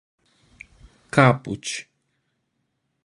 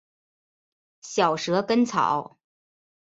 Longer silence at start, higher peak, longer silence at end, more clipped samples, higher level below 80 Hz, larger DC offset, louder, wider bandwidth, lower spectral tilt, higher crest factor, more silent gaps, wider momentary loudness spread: about the same, 1.15 s vs 1.05 s; first, -2 dBFS vs -8 dBFS; first, 1.25 s vs 0.8 s; neither; first, -58 dBFS vs -70 dBFS; neither; first, -21 LUFS vs -24 LUFS; first, 11.5 kHz vs 8 kHz; about the same, -5.5 dB/octave vs -4.5 dB/octave; about the same, 24 dB vs 20 dB; neither; first, 14 LU vs 6 LU